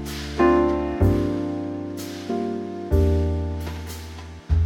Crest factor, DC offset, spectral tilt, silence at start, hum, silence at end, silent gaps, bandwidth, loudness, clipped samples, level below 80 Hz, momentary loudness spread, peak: 16 dB; under 0.1%; -7.5 dB/octave; 0 s; none; 0 s; none; 16.5 kHz; -24 LUFS; under 0.1%; -30 dBFS; 14 LU; -6 dBFS